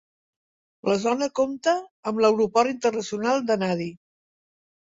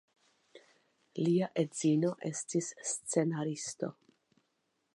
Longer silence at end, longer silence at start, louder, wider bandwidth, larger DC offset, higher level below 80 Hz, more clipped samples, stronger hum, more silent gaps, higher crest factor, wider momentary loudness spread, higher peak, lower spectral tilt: second, 0.9 s vs 1.05 s; first, 0.85 s vs 0.55 s; first, -24 LUFS vs -34 LUFS; second, 7.8 kHz vs 11.5 kHz; neither; first, -66 dBFS vs -82 dBFS; neither; neither; first, 1.91-2.03 s vs none; about the same, 18 dB vs 20 dB; about the same, 8 LU vs 9 LU; first, -6 dBFS vs -16 dBFS; about the same, -5 dB/octave vs -5.5 dB/octave